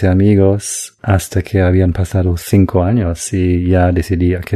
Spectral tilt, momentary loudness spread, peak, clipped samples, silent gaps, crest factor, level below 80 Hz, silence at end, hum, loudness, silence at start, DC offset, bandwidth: -7 dB/octave; 6 LU; 0 dBFS; under 0.1%; none; 12 dB; -30 dBFS; 0 s; none; -14 LUFS; 0 s; under 0.1%; 13.5 kHz